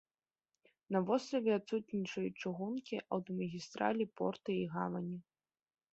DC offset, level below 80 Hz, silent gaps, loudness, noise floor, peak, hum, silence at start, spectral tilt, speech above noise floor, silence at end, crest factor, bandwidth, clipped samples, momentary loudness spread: under 0.1%; -78 dBFS; none; -38 LUFS; under -90 dBFS; -18 dBFS; none; 0.9 s; -5.5 dB/octave; over 52 dB; 0.7 s; 22 dB; 8 kHz; under 0.1%; 7 LU